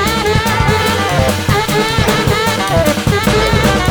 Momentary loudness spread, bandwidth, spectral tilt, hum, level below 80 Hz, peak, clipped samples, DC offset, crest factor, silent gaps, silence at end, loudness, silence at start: 2 LU; over 20 kHz; -4.5 dB/octave; none; -24 dBFS; 0 dBFS; under 0.1%; under 0.1%; 12 dB; none; 0 s; -13 LUFS; 0 s